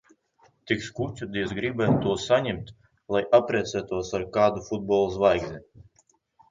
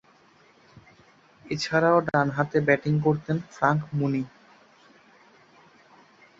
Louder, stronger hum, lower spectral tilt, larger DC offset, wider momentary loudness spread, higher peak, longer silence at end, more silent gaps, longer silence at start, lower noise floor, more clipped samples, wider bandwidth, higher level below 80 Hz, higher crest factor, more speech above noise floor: about the same, -25 LUFS vs -24 LUFS; neither; about the same, -6 dB/octave vs -7 dB/octave; neither; about the same, 11 LU vs 10 LU; about the same, -6 dBFS vs -6 dBFS; second, 0.7 s vs 2.1 s; neither; second, 0.65 s vs 1.45 s; first, -66 dBFS vs -58 dBFS; neither; about the same, 7.6 kHz vs 7.8 kHz; first, -52 dBFS vs -62 dBFS; about the same, 20 dB vs 20 dB; first, 41 dB vs 34 dB